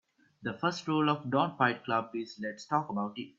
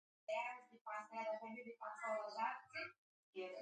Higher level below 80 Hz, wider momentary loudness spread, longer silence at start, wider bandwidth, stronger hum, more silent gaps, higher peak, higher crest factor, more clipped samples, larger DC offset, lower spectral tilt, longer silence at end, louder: first, -76 dBFS vs under -90 dBFS; first, 11 LU vs 8 LU; about the same, 0.4 s vs 0.3 s; second, 7.8 kHz vs 9.4 kHz; neither; second, none vs 0.81-0.85 s, 2.98-3.33 s; first, -10 dBFS vs -30 dBFS; about the same, 22 dB vs 18 dB; neither; neither; first, -6 dB/octave vs -3.5 dB/octave; about the same, 0.1 s vs 0 s; first, -32 LUFS vs -48 LUFS